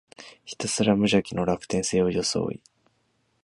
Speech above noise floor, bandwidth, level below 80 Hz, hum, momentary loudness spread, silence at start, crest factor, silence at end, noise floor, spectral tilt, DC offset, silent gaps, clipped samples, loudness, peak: 45 dB; 11.5 kHz; -54 dBFS; none; 19 LU; 0.2 s; 20 dB; 0.9 s; -70 dBFS; -4.5 dB/octave; under 0.1%; none; under 0.1%; -25 LUFS; -6 dBFS